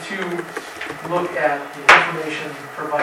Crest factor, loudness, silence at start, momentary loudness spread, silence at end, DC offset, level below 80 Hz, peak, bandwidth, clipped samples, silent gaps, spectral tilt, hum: 20 dB; -18 LUFS; 0 s; 18 LU; 0 s; under 0.1%; -58 dBFS; 0 dBFS; 17 kHz; under 0.1%; none; -3.5 dB/octave; none